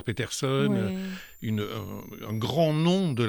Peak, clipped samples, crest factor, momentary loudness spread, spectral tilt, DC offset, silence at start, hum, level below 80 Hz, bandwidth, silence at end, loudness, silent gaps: -12 dBFS; under 0.1%; 16 dB; 13 LU; -6 dB/octave; under 0.1%; 0 s; none; -58 dBFS; 19 kHz; 0 s; -28 LUFS; none